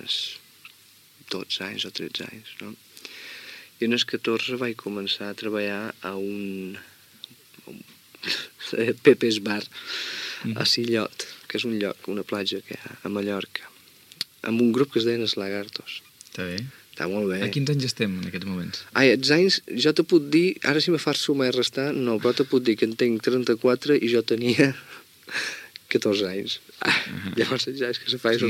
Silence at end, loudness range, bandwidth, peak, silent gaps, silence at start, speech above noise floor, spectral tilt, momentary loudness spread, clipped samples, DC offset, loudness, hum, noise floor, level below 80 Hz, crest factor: 0 s; 9 LU; 16.5 kHz; -2 dBFS; none; 0.05 s; 30 dB; -4.5 dB/octave; 18 LU; under 0.1%; under 0.1%; -24 LUFS; none; -54 dBFS; -72 dBFS; 24 dB